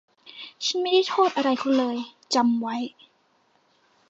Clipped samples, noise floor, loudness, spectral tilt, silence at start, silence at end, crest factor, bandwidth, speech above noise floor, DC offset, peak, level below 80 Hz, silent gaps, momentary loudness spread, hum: under 0.1%; -65 dBFS; -24 LUFS; -3 dB/octave; 0.25 s; 1.2 s; 16 dB; 8 kHz; 42 dB; under 0.1%; -8 dBFS; -82 dBFS; none; 15 LU; none